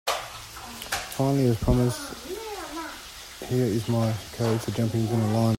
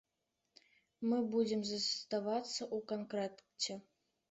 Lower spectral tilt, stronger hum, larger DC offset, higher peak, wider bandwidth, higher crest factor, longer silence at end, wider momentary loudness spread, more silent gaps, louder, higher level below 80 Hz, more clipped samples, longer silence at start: first, -6 dB/octave vs -4 dB/octave; neither; neither; first, -8 dBFS vs -22 dBFS; first, 16.5 kHz vs 8.2 kHz; about the same, 18 dB vs 18 dB; second, 0 s vs 0.5 s; first, 15 LU vs 7 LU; neither; first, -27 LUFS vs -38 LUFS; first, -42 dBFS vs -82 dBFS; neither; second, 0.05 s vs 1 s